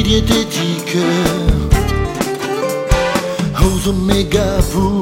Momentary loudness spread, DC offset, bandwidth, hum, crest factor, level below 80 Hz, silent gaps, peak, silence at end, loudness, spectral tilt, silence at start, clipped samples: 5 LU; under 0.1%; 16.5 kHz; none; 14 dB; -20 dBFS; none; 0 dBFS; 0 s; -16 LUFS; -5 dB/octave; 0 s; under 0.1%